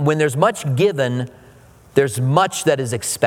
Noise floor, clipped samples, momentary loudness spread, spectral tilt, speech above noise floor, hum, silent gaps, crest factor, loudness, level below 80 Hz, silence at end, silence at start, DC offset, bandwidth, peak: -46 dBFS; under 0.1%; 6 LU; -5 dB/octave; 29 dB; none; none; 18 dB; -18 LUFS; -56 dBFS; 0 s; 0 s; under 0.1%; 17.5 kHz; 0 dBFS